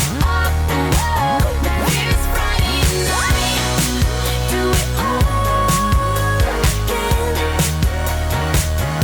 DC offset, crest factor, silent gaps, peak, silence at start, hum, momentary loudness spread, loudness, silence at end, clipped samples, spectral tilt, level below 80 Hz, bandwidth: under 0.1%; 12 dB; none; -6 dBFS; 0 s; none; 3 LU; -17 LUFS; 0 s; under 0.1%; -4 dB/octave; -20 dBFS; over 20 kHz